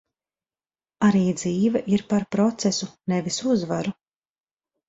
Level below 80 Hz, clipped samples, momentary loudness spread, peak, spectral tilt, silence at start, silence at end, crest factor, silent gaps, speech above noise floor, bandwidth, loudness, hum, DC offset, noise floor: -60 dBFS; under 0.1%; 7 LU; -6 dBFS; -5.5 dB/octave; 1 s; 0.95 s; 18 dB; none; over 68 dB; 8 kHz; -23 LUFS; none; under 0.1%; under -90 dBFS